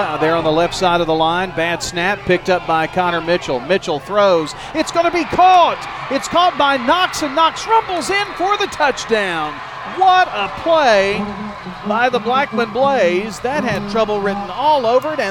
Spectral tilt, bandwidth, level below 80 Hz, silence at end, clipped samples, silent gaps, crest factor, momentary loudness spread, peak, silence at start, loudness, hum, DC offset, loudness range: -4 dB/octave; 17 kHz; -44 dBFS; 0 s; under 0.1%; none; 14 dB; 8 LU; -2 dBFS; 0 s; -16 LUFS; none; under 0.1%; 2 LU